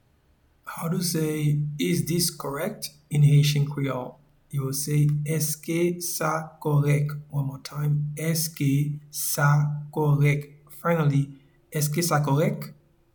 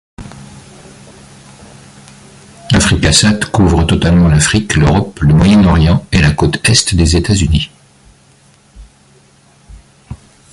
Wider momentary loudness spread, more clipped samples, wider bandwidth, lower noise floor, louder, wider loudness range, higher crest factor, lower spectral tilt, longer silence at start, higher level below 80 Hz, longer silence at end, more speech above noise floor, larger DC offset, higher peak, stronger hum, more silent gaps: first, 11 LU vs 6 LU; neither; first, 19.5 kHz vs 11.5 kHz; first, -63 dBFS vs -46 dBFS; second, -25 LUFS vs -10 LUFS; second, 2 LU vs 8 LU; about the same, 16 dB vs 12 dB; about the same, -5.5 dB/octave vs -5 dB/octave; first, 0.65 s vs 0.2 s; second, -58 dBFS vs -22 dBFS; about the same, 0.4 s vs 0.4 s; about the same, 38 dB vs 37 dB; neither; second, -10 dBFS vs 0 dBFS; neither; neither